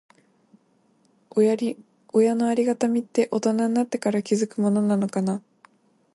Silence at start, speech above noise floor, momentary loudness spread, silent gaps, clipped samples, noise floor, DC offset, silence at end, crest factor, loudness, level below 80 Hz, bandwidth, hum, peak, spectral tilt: 1.35 s; 41 dB; 7 LU; none; under 0.1%; -63 dBFS; under 0.1%; 0.75 s; 16 dB; -23 LUFS; -72 dBFS; 11.5 kHz; none; -8 dBFS; -6.5 dB/octave